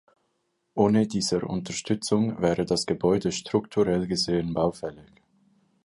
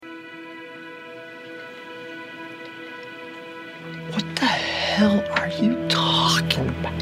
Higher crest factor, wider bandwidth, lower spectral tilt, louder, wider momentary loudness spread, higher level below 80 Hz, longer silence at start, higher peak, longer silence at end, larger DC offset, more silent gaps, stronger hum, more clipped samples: second, 18 dB vs 24 dB; second, 11.5 kHz vs 16 kHz; about the same, -5.5 dB/octave vs -4.5 dB/octave; second, -25 LUFS vs -21 LUFS; second, 7 LU vs 19 LU; about the same, -54 dBFS vs -50 dBFS; first, 0.75 s vs 0 s; second, -8 dBFS vs -2 dBFS; first, 0.85 s vs 0 s; neither; neither; neither; neither